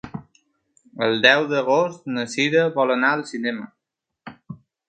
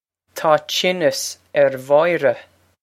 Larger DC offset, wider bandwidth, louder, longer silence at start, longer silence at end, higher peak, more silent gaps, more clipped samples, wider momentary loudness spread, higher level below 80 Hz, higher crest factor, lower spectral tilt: neither; second, 9.4 kHz vs 16 kHz; about the same, -20 LUFS vs -18 LUFS; second, 0.05 s vs 0.35 s; about the same, 0.35 s vs 0.4 s; about the same, 0 dBFS vs 0 dBFS; neither; neither; first, 23 LU vs 9 LU; first, -64 dBFS vs -70 dBFS; about the same, 22 dB vs 18 dB; first, -4.5 dB/octave vs -3 dB/octave